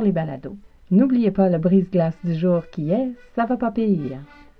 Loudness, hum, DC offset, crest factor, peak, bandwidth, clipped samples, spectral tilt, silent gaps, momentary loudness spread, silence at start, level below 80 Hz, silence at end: -21 LUFS; none; under 0.1%; 16 dB; -4 dBFS; 5.2 kHz; under 0.1%; -11 dB/octave; none; 12 LU; 0 s; -50 dBFS; 0.35 s